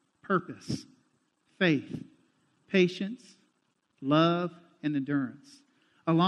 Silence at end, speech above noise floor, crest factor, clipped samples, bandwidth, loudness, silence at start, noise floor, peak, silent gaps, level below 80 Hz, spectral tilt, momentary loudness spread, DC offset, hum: 0 s; 46 dB; 20 dB; under 0.1%; 10.5 kHz; -30 LUFS; 0.3 s; -75 dBFS; -10 dBFS; none; -72 dBFS; -6.5 dB/octave; 14 LU; under 0.1%; none